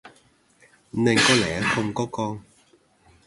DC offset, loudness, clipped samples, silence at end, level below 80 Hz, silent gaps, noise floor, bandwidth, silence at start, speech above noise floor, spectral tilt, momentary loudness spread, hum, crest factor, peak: under 0.1%; -22 LUFS; under 0.1%; 0.85 s; -54 dBFS; none; -60 dBFS; 11.5 kHz; 0.05 s; 37 dB; -4 dB/octave; 15 LU; none; 20 dB; -6 dBFS